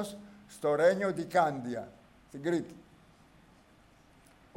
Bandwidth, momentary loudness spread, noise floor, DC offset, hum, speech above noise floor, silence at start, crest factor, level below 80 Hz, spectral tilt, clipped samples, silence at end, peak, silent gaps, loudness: 16 kHz; 23 LU; -61 dBFS; under 0.1%; none; 31 dB; 0 s; 20 dB; -68 dBFS; -6 dB/octave; under 0.1%; 1.75 s; -14 dBFS; none; -31 LUFS